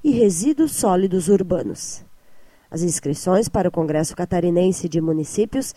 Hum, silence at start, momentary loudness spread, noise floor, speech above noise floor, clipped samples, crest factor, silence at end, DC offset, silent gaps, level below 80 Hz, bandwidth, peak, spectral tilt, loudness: none; 0 s; 8 LU; -46 dBFS; 27 dB; under 0.1%; 16 dB; 0.05 s; under 0.1%; none; -46 dBFS; 15 kHz; -4 dBFS; -6 dB/octave; -20 LUFS